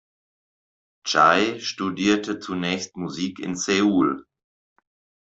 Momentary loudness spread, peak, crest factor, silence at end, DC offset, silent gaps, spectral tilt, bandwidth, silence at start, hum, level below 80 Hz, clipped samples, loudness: 12 LU; -4 dBFS; 20 dB; 1.1 s; under 0.1%; none; -4 dB/octave; 8 kHz; 1.05 s; none; -64 dBFS; under 0.1%; -22 LUFS